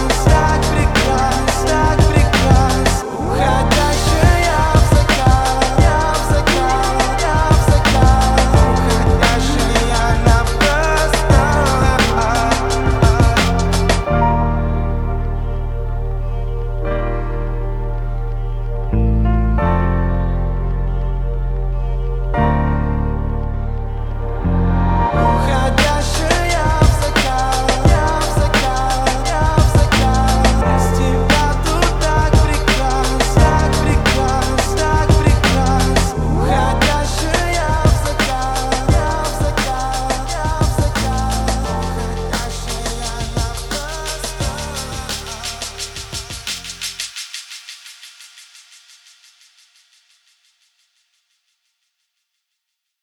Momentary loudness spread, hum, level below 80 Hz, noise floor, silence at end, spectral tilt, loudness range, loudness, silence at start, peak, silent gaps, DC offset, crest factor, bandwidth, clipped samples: 11 LU; none; -20 dBFS; -76 dBFS; 4.6 s; -5 dB/octave; 10 LU; -16 LUFS; 0 s; 0 dBFS; none; under 0.1%; 14 dB; 17.5 kHz; under 0.1%